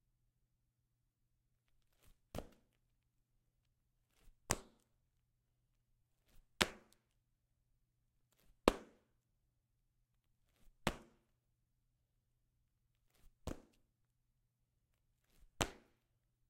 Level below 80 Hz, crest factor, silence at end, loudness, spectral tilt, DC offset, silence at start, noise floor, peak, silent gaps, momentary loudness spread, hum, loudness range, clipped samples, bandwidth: -62 dBFS; 42 dB; 0.75 s; -41 LUFS; -3 dB/octave; under 0.1%; 2.35 s; -85 dBFS; -8 dBFS; none; 16 LU; none; 18 LU; under 0.1%; 16 kHz